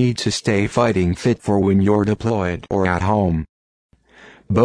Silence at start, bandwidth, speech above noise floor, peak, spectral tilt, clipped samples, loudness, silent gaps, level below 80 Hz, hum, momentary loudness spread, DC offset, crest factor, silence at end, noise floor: 0 s; 10.5 kHz; 29 dB; -2 dBFS; -6.5 dB/octave; under 0.1%; -19 LUFS; 3.49-3.90 s; -40 dBFS; none; 6 LU; under 0.1%; 16 dB; 0 s; -47 dBFS